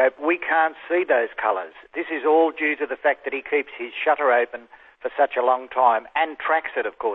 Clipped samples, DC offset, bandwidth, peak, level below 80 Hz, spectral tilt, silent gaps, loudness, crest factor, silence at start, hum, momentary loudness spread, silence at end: under 0.1%; under 0.1%; 4 kHz; -4 dBFS; -68 dBFS; -6 dB/octave; none; -22 LUFS; 18 dB; 0 s; none; 10 LU; 0 s